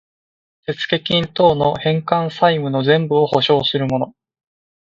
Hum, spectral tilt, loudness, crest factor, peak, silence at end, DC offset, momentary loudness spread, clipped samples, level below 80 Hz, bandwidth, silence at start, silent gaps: none; -7 dB/octave; -17 LUFS; 18 dB; 0 dBFS; 0.85 s; under 0.1%; 9 LU; under 0.1%; -52 dBFS; 7.4 kHz; 0.7 s; none